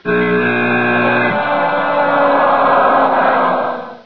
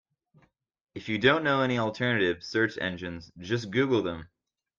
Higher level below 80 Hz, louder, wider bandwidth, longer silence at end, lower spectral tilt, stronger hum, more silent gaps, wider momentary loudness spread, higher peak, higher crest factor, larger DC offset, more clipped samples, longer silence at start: first, -56 dBFS vs -64 dBFS; first, -13 LUFS vs -27 LUFS; second, 5.4 kHz vs 7.4 kHz; second, 0.05 s vs 0.55 s; first, -8.5 dB/octave vs -6 dB/octave; neither; neither; second, 4 LU vs 17 LU; first, -2 dBFS vs -8 dBFS; second, 12 dB vs 22 dB; first, 1% vs under 0.1%; neither; second, 0 s vs 0.95 s